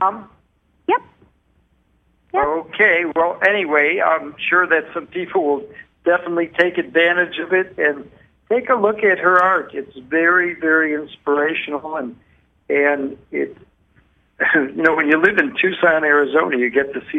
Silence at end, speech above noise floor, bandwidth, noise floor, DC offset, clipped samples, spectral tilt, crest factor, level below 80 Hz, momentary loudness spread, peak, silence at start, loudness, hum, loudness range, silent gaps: 0 s; 43 dB; 7.6 kHz; -60 dBFS; under 0.1%; under 0.1%; -6.5 dB/octave; 18 dB; -58 dBFS; 11 LU; -2 dBFS; 0 s; -17 LUFS; none; 4 LU; none